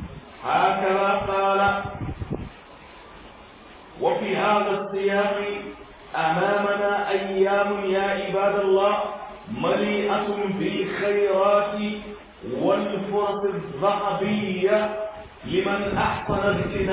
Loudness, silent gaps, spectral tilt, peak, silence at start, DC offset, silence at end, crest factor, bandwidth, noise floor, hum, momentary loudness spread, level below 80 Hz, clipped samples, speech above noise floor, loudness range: -23 LUFS; none; -9.5 dB/octave; -8 dBFS; 0 s; under 0.1%; 0 s; 16 dB; 4 kHz; -46 dBFS; none; 13 LU; -48 dBFS; under 0.1%; 23 dB; 3 LU